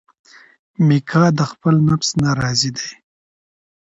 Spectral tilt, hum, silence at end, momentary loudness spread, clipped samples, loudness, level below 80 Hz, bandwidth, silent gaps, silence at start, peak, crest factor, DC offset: -5.5 dB/octave; none; 1 s; 6 LU; under 0.1%; -17 LUFS; -50 dBFS; 8 kHz; none; 0.8 s; -2 dBFS; 18 dB; under 0.1%